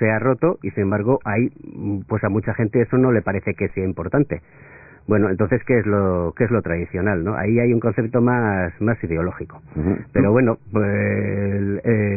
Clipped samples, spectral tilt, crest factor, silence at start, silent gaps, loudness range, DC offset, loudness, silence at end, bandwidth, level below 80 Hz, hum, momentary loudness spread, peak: under 0.1%; -16.5 dB/octave; 16 dB; 0 s; none; 2 LU; under 0.1%; -20 LUFS; 0 s; 2.7 kHz; -40 dBFS; none; 7 LU; -4 dBFS